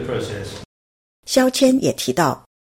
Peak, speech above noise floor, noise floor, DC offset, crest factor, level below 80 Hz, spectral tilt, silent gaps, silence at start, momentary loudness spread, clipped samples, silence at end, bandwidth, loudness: -4 dBFS; over 72 dB; under -90 dBFS; under 0.1%; 18 dB; -52 dBFS; -4.5 dB/octave; 0.65-1.23 s; 0 s; 18 LU; under 0.1%; 0.4 s; 16.5 kHz; -18 LUFS